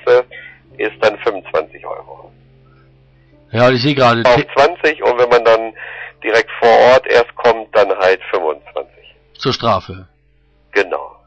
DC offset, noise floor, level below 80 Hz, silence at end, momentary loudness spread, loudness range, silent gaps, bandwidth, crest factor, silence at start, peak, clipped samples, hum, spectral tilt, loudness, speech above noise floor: under 0.1%; -54 dBFS; -48 dBFS; 0.2 s; 18 LU; 7 LU; none; 8.2 kHz; 12 dB; 0.05 s; -2 dBFS; under 0.1%; none; -5.5 dB/octave; -13 LUFS; 41 dB